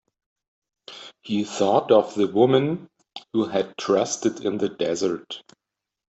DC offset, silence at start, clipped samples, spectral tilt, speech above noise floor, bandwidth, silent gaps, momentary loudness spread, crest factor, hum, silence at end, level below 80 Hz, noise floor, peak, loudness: under 0.1%; 0.9 s; under 0.1%; -5 dB/octave; 22 dB; 8.2 kHz; none; 21 LU; 20 dB; none; 0.7 s; -68 dBFS; -44 dBFS; -4 dBFS; -23 LUFS